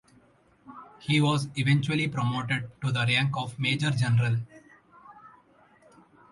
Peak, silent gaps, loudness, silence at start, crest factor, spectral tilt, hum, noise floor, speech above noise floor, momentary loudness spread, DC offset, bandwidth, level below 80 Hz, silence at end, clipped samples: -12 dBFS; none; -26 LUFS; 0.65 s; 16 dB; -5.5 dB/octave; none; -61 dBFS; 35 dB; 9 LU; under 0.1%; 11.5 kHz; -62 dBFS; 1.05 s; under 0.1%